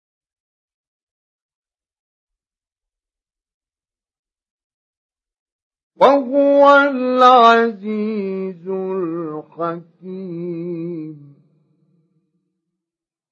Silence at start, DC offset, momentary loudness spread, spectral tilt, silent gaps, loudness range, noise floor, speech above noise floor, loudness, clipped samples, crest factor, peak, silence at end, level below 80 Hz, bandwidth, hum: 6 s; under 0.1%; 19 LU; -6.5 dB/octave; none; 16 LU; under -90 dBFS; over 74 dB; -15 LUFS; under 0.1%; 20 dB; 0 dBFS; 2.15 s; -80 dBFS; 7.2 kHz; none